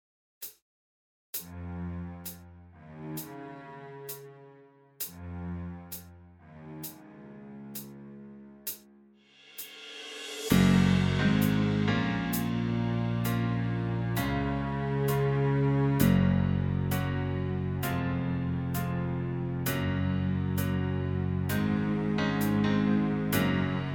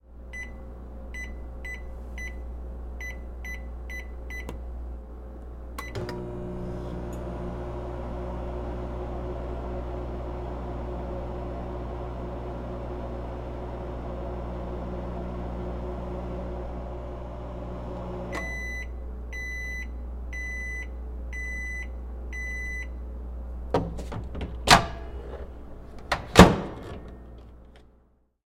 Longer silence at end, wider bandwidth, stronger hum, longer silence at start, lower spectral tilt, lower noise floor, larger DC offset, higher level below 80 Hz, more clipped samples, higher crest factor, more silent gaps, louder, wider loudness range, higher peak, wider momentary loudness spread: second, 0 s vs 0.7 s; first, over 20 kHz vs 16.5 kHz; neither; first, 0.4 s vs 0.05 s; first, -6.5 dB/octave vs -5 dB/octave; about the same, -59 dBFS vs -62 dBFS; neither; second, -48 dBFS vs -36 dBFS; neither; second, 22 dB vs 30 dB; first, 0.62-1.33 s vs none; about the same, -29 LUFS vs -31 LUFS; about the same, 16 LU vs 14 LU; second, -8 dBFS vs 0 dBFS; first, 18 LU vs 8 LU